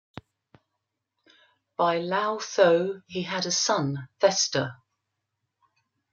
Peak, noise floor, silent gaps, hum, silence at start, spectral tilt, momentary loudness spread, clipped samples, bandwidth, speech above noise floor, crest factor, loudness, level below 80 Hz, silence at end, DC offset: -8 dBFS; -82 dBFS; none; none; 1.8 s; -3 dB/octave; 11 LU; under 0.1%; 10 kHz; 57 dB; 20 dB; -25 LUFS; -74 dBFS; 1.4 s; under 0.1%